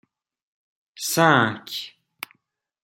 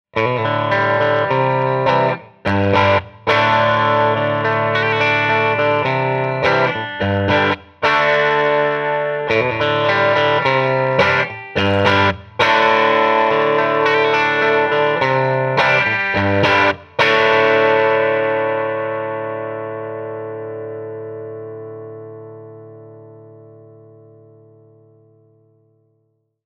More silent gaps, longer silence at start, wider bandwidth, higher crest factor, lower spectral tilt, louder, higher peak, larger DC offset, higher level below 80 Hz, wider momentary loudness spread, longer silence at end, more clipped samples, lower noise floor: neither; first, 1 s vs 0.15 s; first, 17 kHz vs 7.4 kHz; first, 24 dB vs 16 dB; second, -4 dB/octave vs -6 dB/octave; second, -21 LUFS vs -15 LUFS; about the same, -2 dBFS vs 0 dBFS; neither; second, -68 dBFS vs -54 dBFS; first, 22 LU vs 14 LU; second, 0.95 s vs 3 s; neither; first, -74 dBFS vs -66 dBFS